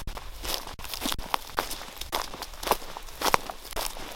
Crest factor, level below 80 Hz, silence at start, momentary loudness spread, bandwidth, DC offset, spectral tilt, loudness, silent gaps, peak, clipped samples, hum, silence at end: 32 dB; -42 dBFS; 0 s; 10 LU; 17 kHz; under 0.1%; -2 dB/octave; -31 LUFS; none; 0 dBFS; under 0.1%; none; 0 s